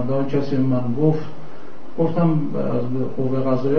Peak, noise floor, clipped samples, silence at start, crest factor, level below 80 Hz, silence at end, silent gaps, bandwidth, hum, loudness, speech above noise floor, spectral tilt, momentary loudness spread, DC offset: -6 dBFS; -41 dBFS; under 0.1%; 0 s; 16 dB; -54 dBFS; 0 s; none; 6.4 kHz; none; -21 LUFS; 21 dB; -10 dB/octave; 17 LU; 8%